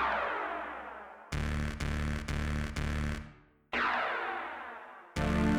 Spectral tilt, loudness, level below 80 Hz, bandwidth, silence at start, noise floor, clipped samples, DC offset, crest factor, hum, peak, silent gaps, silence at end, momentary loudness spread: -6 dB/octave; -35 LUFS; -40 dBFS; 14 kHz; 0 s; -55 dBFS; under 0.1%; under 0.1%; 16 dB; none; -18 dBFS; none; 0 s; 13 LU